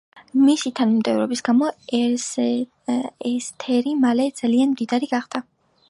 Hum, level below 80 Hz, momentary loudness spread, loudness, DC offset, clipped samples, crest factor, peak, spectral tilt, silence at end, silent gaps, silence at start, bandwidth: none; -72 dBFS; 8 LU; -21 LUFS; under 0.1%; under 0.1%; 14 dB; -6 dBFS; -4 dB/octave; 0.5 s; none; 0.15 s; 11.5 kHz